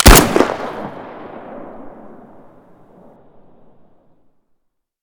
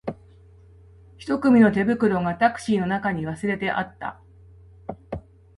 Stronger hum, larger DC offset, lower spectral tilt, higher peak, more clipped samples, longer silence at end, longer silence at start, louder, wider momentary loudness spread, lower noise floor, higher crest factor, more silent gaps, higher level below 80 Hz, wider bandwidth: neither; neither; second, -3.5 dB/octave vs -7 dB/octave; first, 0 dBFS vs -6 dBFS; first, 1% vs under 0.1%; first, 3.1 s vs 0.4 s; about the same, 0 s vs 0.05 s; first, -13 LUFS vs -22 LUFS; first, 29 LU vs 21 LU; first, -65 dBFS vs -50 dBFS; about the same, 18 dB vs 18 dB; neither; first, -22 dBFS vs -52 dBFS; first, over 20 kHz vs 11.5 kHz